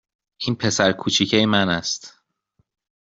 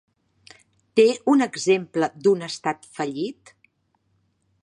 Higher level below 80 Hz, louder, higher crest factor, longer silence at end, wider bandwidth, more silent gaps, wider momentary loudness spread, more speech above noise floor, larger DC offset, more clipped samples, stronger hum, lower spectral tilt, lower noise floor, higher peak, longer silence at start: first, -56 dBFS vs -74 dBFS; about the same, -20 LUFS vs -22 LUFS; about the same, 22 dB vs 18 dB; second, 1.05 s vs 1.3 s; second, 8 kHz vs 11 kHz; neither; about the same, 10 LU vs 11 LU; about the same, 48 dB vs 48 dB; neither; neither; neither; second, -3.5 dB/octave vs -5 dB/octave; about the same, -68 dBFS vs -69 dBFS; first, 0 dBFS vs -6 dBFS; second, 0.4 s vs 0.95 s